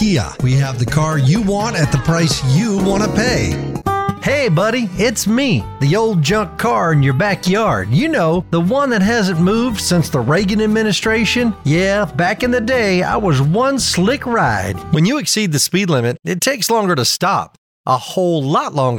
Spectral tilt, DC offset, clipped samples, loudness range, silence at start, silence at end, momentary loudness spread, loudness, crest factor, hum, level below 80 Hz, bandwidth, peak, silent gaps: -5 dB/octave; under 0.1%; under 0.1%; 1 LU; 0 s; 0 s; 3 LU; -15 LUFS; 14 dB; none; -36 dBFS; 17.5 kHz; -2 dBFS; 17.58-17.84 s